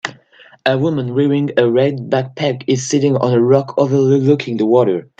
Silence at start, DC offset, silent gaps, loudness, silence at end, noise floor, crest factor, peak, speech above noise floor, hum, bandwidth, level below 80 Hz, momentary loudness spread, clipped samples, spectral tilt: 0.05 s; under 0.1%; none; -15 LUFS; 0.15 s; -46 dBFS; 14 dB; 0 dBFS; 32 dB; none; 8.8 kHz; -60 dBFS; 6 LU; under 0.1%; -6.5 dB/octave